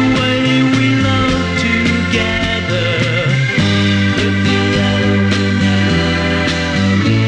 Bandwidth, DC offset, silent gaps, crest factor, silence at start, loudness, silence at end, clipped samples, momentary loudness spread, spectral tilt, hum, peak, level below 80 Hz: 10 kHz; under 0.1%; none; 12 dB; 0 s; -13 LUFS; 0 s; under 0.1%; 2 LU; -5.5 dB/octave; none; -2 dBFS; -32 dBFS